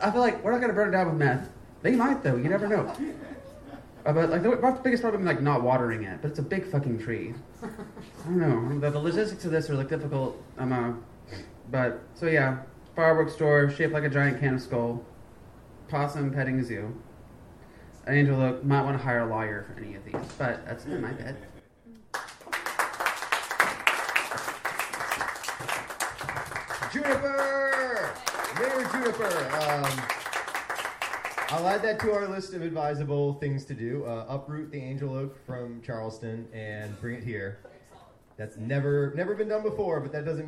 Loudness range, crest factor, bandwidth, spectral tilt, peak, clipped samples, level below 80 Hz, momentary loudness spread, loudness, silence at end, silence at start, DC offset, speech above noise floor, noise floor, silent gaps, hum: 8 LU; 24 dB; 16 kHz; -6 dB/octave; -4 dBFS; under 0.1%; -58 dBFS; 14 LU; -28 LUFS; 0 s; 0 s; under 0.1%; 27 dB; -54 dBFS; none; none